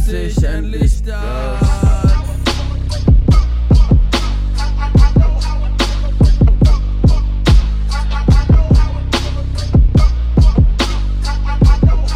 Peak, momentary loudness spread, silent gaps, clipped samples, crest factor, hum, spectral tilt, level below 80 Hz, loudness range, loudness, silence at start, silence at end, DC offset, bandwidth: 0 dBFS; 8 LU; none; under 0.1%; 12 dB; none; -6.5 dB/octave; -12 dBFS; 1 LU; -14 LUFS; 0 s; 0 s; under 0.1%; 10.5 kHz